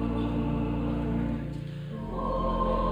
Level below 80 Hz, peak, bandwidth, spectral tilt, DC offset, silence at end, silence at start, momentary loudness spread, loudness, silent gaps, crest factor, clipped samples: -36 dBFS; -16 dBFS; over 20 kHz; -9 dB/octave; under 0.1%; 0 s; 0 s; 9 LU; -31 LUFS; none; 12 dB; under 0.1%